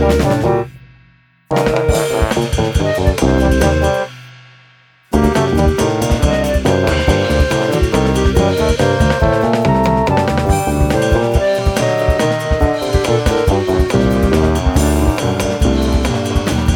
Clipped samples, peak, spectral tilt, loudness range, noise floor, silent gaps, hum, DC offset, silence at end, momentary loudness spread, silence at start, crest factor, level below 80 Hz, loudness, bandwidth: under 0.1%; 0 dBFS; -6 dB/octave; 2 LU; -50 dBFS; none; none; under 0.1%; 0 s; 3 LU; 0 s; 14 dB; -20 dBFS; -14 LUFS; 18 kHz